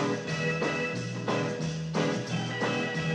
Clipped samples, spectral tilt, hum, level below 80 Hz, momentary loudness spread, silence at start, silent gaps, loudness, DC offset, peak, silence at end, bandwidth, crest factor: under 0.1%; -5.5 dB/octave; none; -64 dBFS; 3 LU; 0 s; none; -30 LUFS; under 0.1%; -16 dBFS; 0 s; 10 kHz; 14 dB